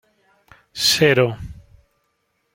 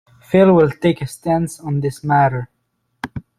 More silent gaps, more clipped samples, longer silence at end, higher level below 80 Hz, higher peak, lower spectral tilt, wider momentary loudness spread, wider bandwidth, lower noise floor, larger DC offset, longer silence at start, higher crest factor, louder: neither; neither; first, 1 s vs 0.2 s; about the same, -48 dBFS vs -48 dBFS; about the same, -2 dBFS vs -2 dBFS; second, -3.5 dB/octave vs -7.5 dB/octave; first, 22 LU vs 18 LU; first, 16.5 kHz vs 14.5 kHz; about the same, -70 dBFS vs -69 dBFS; neither; first, 0.75 s vs 0.3 s; about the same, 20 dB vs 16 dB; about the same, -16 LUFS vs -16 LUFS